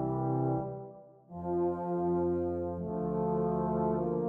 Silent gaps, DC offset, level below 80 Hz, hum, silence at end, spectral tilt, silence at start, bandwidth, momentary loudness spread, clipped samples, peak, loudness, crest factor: none; under 0.1%; -56 dBFS; none; 0 s; -13 dB/octave; 0 s; 2.6 kHz; 10 LU; under 0.1%; -18 dBFS; -33 LUFS; 14 dB